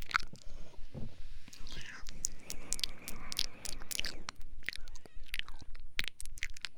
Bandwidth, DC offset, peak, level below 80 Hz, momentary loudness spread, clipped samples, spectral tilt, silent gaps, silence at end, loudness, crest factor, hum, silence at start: over 20 kHz; under 0.1%; -8 dBFS; -46 dBFS; 17 LU; under 0.1%; -1 dB/octave; none; 0 s; -41 LUFS; 26 dB; none; 0 s